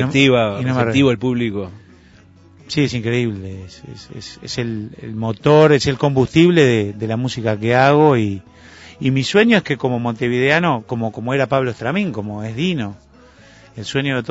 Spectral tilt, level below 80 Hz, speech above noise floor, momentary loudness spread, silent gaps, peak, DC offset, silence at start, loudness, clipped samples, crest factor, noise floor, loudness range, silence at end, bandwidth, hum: -6 dB/octave; -48 dBFS; 30 dB; 17 LU; none; 0 dBFS; under 0.1%; 0 s; -17 LUFS; under 0.1%; 16 dB; -46 dBFS; 9 LU; 0 s; 8 kHz; none